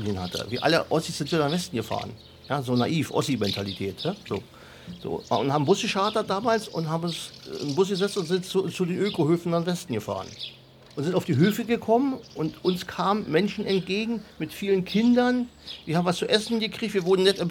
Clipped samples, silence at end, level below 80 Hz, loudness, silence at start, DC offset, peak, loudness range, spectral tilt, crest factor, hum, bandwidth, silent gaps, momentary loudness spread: under 0.1%; 0 s; -60 dBFS; -26 LUFS; 0 s; under 0.1%; -4 dBFS; 2 LU; -5.5 dB/octave; 20 dB; none; 18 kHz; none; 12 LU